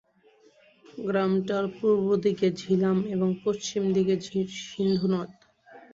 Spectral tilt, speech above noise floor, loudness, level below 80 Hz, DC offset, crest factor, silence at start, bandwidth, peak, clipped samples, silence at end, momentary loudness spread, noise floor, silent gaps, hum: -6.5 dB/octave; 35 dB; -26 LUFS; -66 dBFS; under 0.1%; 14 dB; 0.95 s; 7.8 kHz; -12 dBFS; under 0.1%; 0.15 s; 7 LU; -60 dBFS; none; none